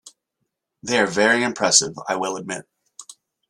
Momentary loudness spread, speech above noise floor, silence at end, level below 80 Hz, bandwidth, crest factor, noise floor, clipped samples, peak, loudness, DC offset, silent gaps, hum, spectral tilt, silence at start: 16 LU; 57 dB; 0.4 s; -66 dBFS; 13.5 kHz; 24 dB; -78 dBFS; under 0.1%; 0 dBFS; -19 LUFS; under 0.1%; none; none; -1.5 dB/octave; 0.05 s